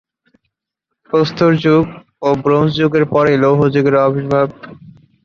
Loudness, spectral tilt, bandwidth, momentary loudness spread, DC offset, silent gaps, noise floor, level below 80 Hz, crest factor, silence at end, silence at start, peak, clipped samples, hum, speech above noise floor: -14 LUFS; -8 dB/octave; 7 kHz; 6 LU; under 0.1%; none; -77 dBFS; -50 dBFS; 14 dB; 0.35 s; 1.15 s; -2 dBFS; under 0.1%; none; 64 dB